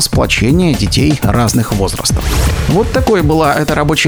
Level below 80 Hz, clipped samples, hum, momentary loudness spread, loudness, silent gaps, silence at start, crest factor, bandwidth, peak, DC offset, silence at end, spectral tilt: -20 dBFS; under 0.1%; none; 3 LU; -12 LUFS; none; 0 s; 12 dB; over 20 kHz; 0 dBFS; under 0.1%; 0 s; -5 dB/octave